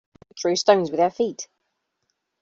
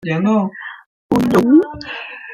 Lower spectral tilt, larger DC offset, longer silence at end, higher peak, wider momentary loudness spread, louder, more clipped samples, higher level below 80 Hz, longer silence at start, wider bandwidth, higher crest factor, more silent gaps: second, -3.5 dB/octave vs -7 dB/octave; neither; first, 1 s vs 0 s; about the same, -4 dBFS vs -2 dBFS; about the same, 16 LU vs 17 LU; second, -21 LUFS vs -15 LUFS; neither; second, -68 dBFS vs -50 dBFS; first, 0.35 s vs 0.05 s; second, 7.8 kHz vs 15.5 kHz; first, 20 dB vs 14 dB; second, none vs 0.86-1.09 s